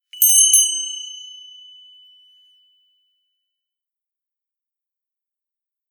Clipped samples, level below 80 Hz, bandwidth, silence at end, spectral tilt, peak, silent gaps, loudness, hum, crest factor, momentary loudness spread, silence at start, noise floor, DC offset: under 0.1%; under -90 dBFS; over 20 kHz; 4.55 s; 12.5 dB/octave; 0 dBFS; none; -12 LUFS; none; 24 dB; 25 LU; 0.15 s; -87 dBFS; under 0.1%